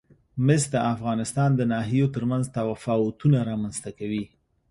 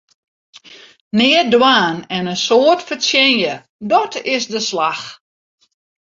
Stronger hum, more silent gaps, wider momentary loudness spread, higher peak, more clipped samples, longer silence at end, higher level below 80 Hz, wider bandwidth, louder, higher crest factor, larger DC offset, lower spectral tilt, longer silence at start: neither; second, none vs 1.01-1.11 s, 3.69-3.79 s; about the same, 10 LU vs 10 LU; second, -6 dBFS vs 0 dBFS; neither; second, 0.45 s vs 0.9 s; first, -56 dBFS vs -62 dBFS; first, 11.5 kHz vs 7.8 kHz; second, -25 LUFS vs -14 LUFS; about the same, 18 dB vs 16 dB; neither; first, -6.5 dB/octave vs -3 dB/octave; second, 0.35 s vs 0.55 s